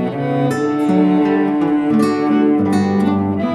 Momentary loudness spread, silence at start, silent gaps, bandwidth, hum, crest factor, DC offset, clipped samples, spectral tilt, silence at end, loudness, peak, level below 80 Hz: 4 LU; 0 s; none; 12 kHz; none; 12 dB; under 0.1%; under 0.1%; -8 dB/octave; 0 s; -15 LUFS; -2 dBFS; -56 dBFS